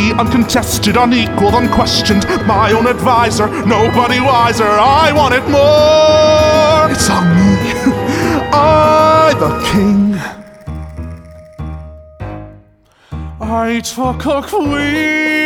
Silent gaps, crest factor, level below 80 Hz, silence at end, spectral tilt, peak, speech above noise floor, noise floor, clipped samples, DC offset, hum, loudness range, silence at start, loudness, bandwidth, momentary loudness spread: none; 12 dB; -32 dBFS; 0 s; -5 dB/octave; 0 dBFS; 38 dB; -48 dBFS; under 0.1%; under 0.1%; none; 12 LU; 0 s; -11 LUFS; over 20 kHz; 19 LU